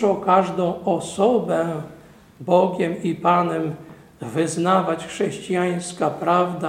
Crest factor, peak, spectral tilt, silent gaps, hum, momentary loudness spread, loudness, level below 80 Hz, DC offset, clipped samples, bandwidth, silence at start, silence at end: 18 dB; -2 dBFS; -6 dB/octave; none; none; 11 LU; -21 LUFS; -60 dBFS; under 0.1%; under 0.1%; 14.5 kHz; 0 s; 0 s